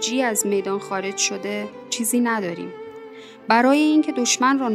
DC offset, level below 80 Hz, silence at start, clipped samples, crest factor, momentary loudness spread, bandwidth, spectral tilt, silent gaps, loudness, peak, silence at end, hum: under 0.1%; -72 dBFS; 0 s; under 0.1%; 18 dB; 20 LU; 15 kHz; -2.5 dB/octave; none; -20 LUFS; -2 dBFS; 0 s; none